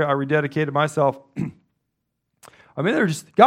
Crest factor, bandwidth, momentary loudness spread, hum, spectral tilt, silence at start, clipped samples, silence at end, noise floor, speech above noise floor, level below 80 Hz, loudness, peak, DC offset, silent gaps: 22 dB; 15 kHz; 11 LU; none; -6 dB/octave; 0 s; under 0.1%; 0 s; -77 dBFS; 57 dB; -66 dBFS; -22 LUFS; 0 dBFS; under 0.1%; none